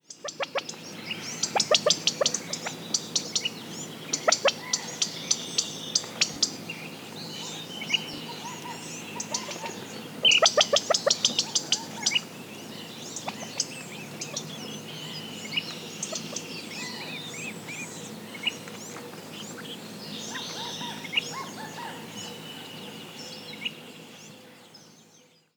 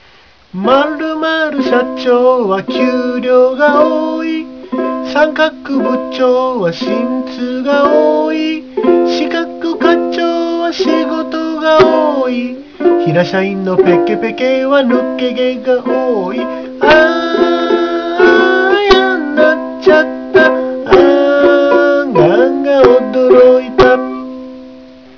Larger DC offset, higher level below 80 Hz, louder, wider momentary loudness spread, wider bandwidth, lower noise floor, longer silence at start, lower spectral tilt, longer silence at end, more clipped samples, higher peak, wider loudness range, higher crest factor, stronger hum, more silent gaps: second, under 0.1% vs 0.3%; second, -80 dBFS vs -42 dBFS; second, -28 LUFS vs -11 LUFS; first, 17 LU vs 9 LU; first, over 20 kHz vs 5.4 kHz; first, -58 dBFS vs -44 dBFS; second, 0.1 s vs 0.55 s; second, -1 dB/octave vs -6 dB/octave; about the same, 0.35 s vs 0.25 s; second, under 0.1% vs 0.5%; second, -6 dBFS vs 0 dBFS; first, 12 LU vs 4 LU; first, 26 dB vs 12 dB; neither; neither